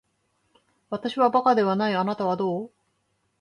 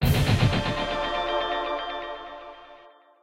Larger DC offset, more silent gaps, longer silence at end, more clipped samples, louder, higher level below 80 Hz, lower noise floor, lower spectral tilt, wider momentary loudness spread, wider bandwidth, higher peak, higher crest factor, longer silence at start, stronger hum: second, under 0.1% vs 0.1%; neither; first, 0.75 s vs 0.35 s; neither; about the same, -24 LUFS vs -26 LUFS; second, -72 dBFS vs -38 dBFS; first, -72 dBFS vs -52 dBFS; about the same, -7 dB/octave vs -6 dB/octave; second, 13 LU vs 19 LU; second, 11 kHz vs 16 kHz; about the same, -8 dBFS vs -10 dBFS; about the same, 18 dB vs 16 dB; first, 0.9 s vs 0 s; neither